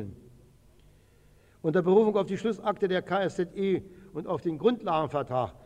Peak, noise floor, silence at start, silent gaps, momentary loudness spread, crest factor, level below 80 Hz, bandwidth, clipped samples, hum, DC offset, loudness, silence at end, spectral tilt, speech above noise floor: -10 dBFS; -59 dBFS; 0 s; none; 11 LU; 18 dB; -60 dBFS; 9.8 kHz; under 0.1%; none; under 0.1%; -28 LUFS; 0.1 s; -7.5 dB/octave; 32 dB